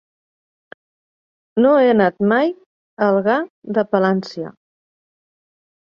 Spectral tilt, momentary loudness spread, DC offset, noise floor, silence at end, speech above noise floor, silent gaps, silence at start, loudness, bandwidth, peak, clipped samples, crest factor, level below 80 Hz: -8 dB/octave; 16 LU; under 0.1%; under -90 dBFS; 1.45 s; over 74 dB; 2.66-2.97 s, 3.50-3.62 s; 1.55 s; -17 LUFS; 7 kHz; -2 dBFS; under 0.1%; 16 dB; -64 dBFS